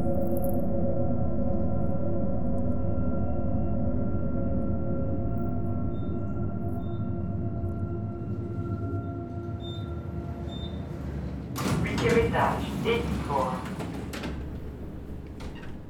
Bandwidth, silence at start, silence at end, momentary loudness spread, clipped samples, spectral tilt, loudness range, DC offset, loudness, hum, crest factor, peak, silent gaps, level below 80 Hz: 18 kHz; 0 s; 0 s; 8 LU; under 0.1%; -7.5 dB/octave; 6 LU; under 0.1%; -31 LUFS; none; 18 dB; -10 dBFS; none; -40 dBFS